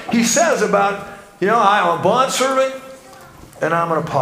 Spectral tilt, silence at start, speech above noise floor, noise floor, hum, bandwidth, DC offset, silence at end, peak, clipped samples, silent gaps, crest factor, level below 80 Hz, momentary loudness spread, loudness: -3.5 dB/octave; 0 s; 24 dB; -40 dBFS; none; 16 kHz; under 0.1%; 0 s; 0 dBFS; under 0.1%; none; 16 dB; -56 dBFS; 10 LU; -16 LUFS